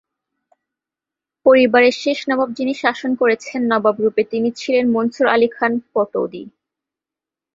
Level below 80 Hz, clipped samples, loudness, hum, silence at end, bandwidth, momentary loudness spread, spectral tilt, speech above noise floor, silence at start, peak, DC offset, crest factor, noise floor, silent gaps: -64 dBFS; under 0.1%; -17 LUFS; none; 1.05 s; 7.8 kHz; 8 LU; -5 dB/octave; 71 dB; 1.45 s; -2 dBFS; under 0.1%; 18 dB; -88 dBFS; none